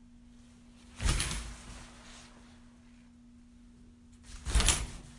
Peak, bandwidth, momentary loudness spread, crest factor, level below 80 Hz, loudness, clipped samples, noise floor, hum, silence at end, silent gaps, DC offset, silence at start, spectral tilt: -10 dBFS; 11.5 kHz; 28 LU; 26 dB; -40 dBFS; -32 LUFS; under 0.1%; -57 dBFS; none; 0 s; none; under 0.1%; 0.15 s; -2.5 dB/octave